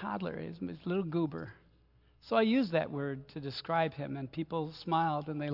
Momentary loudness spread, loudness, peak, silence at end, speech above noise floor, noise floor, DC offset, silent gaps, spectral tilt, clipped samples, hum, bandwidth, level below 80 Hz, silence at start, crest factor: 12 LU; -34 LUFS; -14 dBFS; 0 s; 32 dB; -66 dBFS; under 0.1%; none; -8.5 dB/octave; under 0.1%; none; 5.8 kHz; -68 dBFS; 0 s; 20 dB